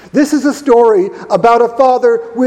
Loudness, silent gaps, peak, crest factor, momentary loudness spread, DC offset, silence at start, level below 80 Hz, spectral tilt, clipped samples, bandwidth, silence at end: -10 LUFS; none; 0 dBFS; 10 dB; 5 LU; under 0.1%; 0.15 s; -50 dBFS; -5.5 dB/octave; 0.3%; 13.5 kHz; 0 s